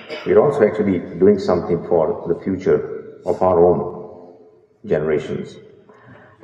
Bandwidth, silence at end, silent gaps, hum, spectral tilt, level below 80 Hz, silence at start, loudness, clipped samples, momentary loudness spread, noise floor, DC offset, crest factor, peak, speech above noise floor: 7.6 kHz; 0.3 s; none; none; -8.5 dB/octave; -52 dBFS; 0 s; -18 LUFS; under 0.1%; 15 LU; -49 dBFS; under 0.1%; 18 dB; -2 dBFS; 32 dB